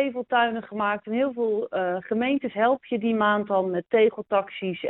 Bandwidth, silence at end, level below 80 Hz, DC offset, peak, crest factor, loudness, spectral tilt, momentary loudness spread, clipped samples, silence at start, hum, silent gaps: 4.1 kHz; 0 s; -68 dBFS; under 0.1%; -8 dBFS; 16 dB; -25 LUFS; -3.5 dB/octave; 5 LU; under 0.1%; 0 s; none; none